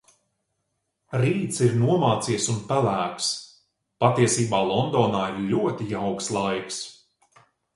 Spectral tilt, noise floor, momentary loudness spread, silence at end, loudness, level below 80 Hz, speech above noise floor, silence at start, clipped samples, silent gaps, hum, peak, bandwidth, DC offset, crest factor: -5 dB/octave; -77 dBFS; 8 LU; 0.85 s; -24 LUFS; -58 dBFS; 54 dB; 1.1 s; under 0.1%; none; none; -2 dBFS; 11.5 kHz; under 0.1%; 22 dB